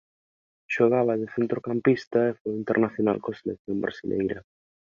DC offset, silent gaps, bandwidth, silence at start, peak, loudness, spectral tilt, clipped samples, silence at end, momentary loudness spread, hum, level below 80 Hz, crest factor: under 0.1%; 2.07-2.11 s, 2.40-2.45 s, 3.59-3.65 s; 7.2 kHz; 0.7 s; -8 dBFS; -26 LUFS; -8 dB/octave; under 0.1%; 0.45 s; 10 LU; none; -62 dBFS; 20 dB